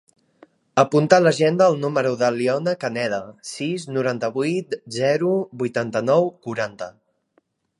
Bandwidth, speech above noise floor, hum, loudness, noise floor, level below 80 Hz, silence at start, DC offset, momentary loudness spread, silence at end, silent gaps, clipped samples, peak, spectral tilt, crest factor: 11.5 kHz; 45 dB; none; -21 LUFS; -66 dBFS; -68 dBFS; 0.75 s; under 0.1%; 12 LU; 0.9 s; none; under 0.1%; 0 dBFS; -5.5 dB/octave; 22 dB